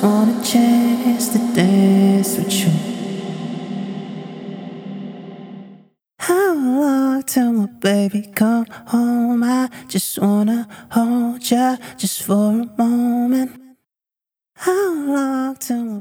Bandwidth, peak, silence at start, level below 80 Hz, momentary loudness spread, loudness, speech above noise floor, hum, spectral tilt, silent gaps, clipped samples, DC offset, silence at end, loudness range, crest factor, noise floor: 17.5 kHz; -2 dBFS; 0 s; -66 dBFS; 16 LU; -18 LUFS; 73 dB; none; -5.5 dB/octave; none; under 0.1%; under 0.1%; 0 s; 7 LU; 16 dB; -89 dBFS